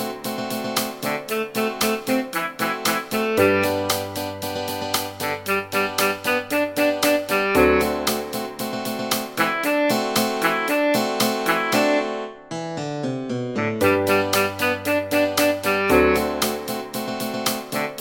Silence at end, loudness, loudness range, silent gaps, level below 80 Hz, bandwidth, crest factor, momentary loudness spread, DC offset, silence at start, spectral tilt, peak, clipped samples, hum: 0 s; -22 LUFS; 3 LU; none; -48 dBFS; 17 kHz; 18 dB; 10 LU; under 0.1%; 0 s; -3.5 dB/octave; -4 dBFS; under 0.1%; none